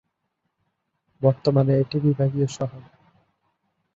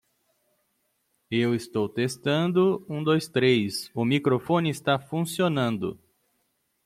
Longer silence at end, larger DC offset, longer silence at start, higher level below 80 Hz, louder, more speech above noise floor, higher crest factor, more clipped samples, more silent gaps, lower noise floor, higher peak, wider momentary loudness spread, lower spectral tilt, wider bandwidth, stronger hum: first, 1.15 s vs 0.9 s; neither; about the same, 1.2 s vs 1.3 s; about the same, -62 dBFS vs -66 dBFS; first, -22 LUFS vs -25 LUFS; first, 56 dB vs 49 dB; about the same, 20 dB vs 18 dB; neither; neither; first, -77 dBFS vs -73 dBFS; first, -4 dBFS vs -8 dBFS; about the same, 8 LU vs 7 LU; first, -8 dB/octave vs -6 dB/octave; second, 7.8 kHz vs 15.5 kHz; neither